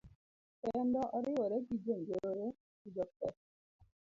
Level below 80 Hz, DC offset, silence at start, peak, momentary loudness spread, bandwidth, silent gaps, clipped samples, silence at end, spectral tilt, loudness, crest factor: -72 dBFS; under 0.1%; 0.05 s; -24 dBFS; 9 LU; 7.4 kHz; 0.15-0.63 s, 2.60-2.85 s, 3.16-3.20 s, 3.37-3.79 s; under 0.1%; 0.3 s; -8 dB/octave; -39 LUFS; 16 dB